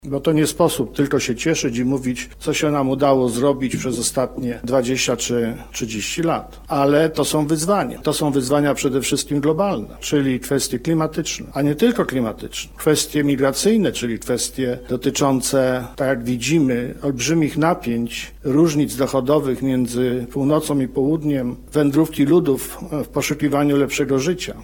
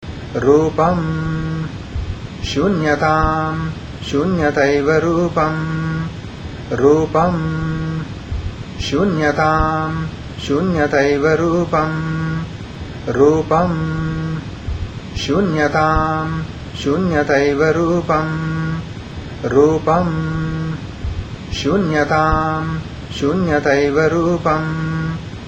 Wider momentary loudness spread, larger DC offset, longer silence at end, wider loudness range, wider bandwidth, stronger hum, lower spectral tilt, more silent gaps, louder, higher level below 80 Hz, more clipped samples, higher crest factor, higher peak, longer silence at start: second, 7 LU vs 12 LU; neither; about the same, 0 s vs 0 s; about the same, 1 LU vs 3 LU; first, 17.5 kHz vs 8.2 kHz; neither; second, -5 dB/octave vs -6.5 dB/octave; neither; about the same, -19 LUFS vs -17 LUFS; second, -44 dBFS vs -32 dBFS; neither; about the same, 16 dB vs 18 dB; about the same, -2 dBFS vs 0 dBFS; about the same, 0.05 s vs 0 s